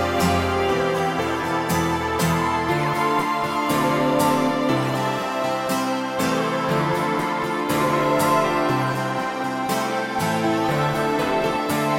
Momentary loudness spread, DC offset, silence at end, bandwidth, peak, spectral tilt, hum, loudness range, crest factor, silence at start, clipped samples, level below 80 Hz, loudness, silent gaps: 4 LU; under 0.1%; 0 s; 16.5 kHz; -6 dBFS; -5 dB/octave; none; 1 LU; 14 dB; 0 s; under 0.1%; -48 dBFS; -21 LUFS; none